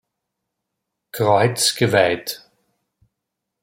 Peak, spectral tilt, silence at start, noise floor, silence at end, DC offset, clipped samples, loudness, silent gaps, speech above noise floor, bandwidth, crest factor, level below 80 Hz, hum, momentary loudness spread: -2 dBFS; -3.5 dB/octave; 1.15 s; -80 dBFS; 1.25 s; under 0.1%; under 0.1%; -18 LUFS; none; 63 dB; 16.5 kHz; 20 dB; -62 dBFS; none; 17 LU